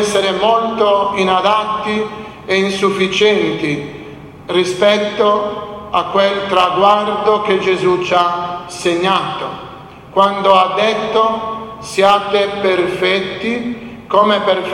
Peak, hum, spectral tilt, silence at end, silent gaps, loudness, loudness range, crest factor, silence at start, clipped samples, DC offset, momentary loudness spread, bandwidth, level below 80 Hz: 0 dBFS; none; -4.5 dB/octave; 0 s; none; -14 LUFS; 2 LU; 14 dB; 0 s; under 0.1%; under 0.1%; 12 LU; 13 kHz; -50 dBFS